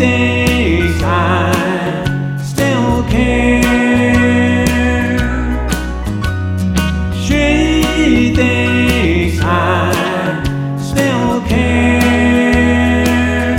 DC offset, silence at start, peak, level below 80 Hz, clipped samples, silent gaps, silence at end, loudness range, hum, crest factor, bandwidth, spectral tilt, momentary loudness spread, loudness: under 0.1%; 0 s; 0 dBFS; -22 dBFS; under 0.1%; none; 0 s; 2 LU; none; 12 dB; 17 kHz; -6 dB/octave; 7 LU; -13 LUFS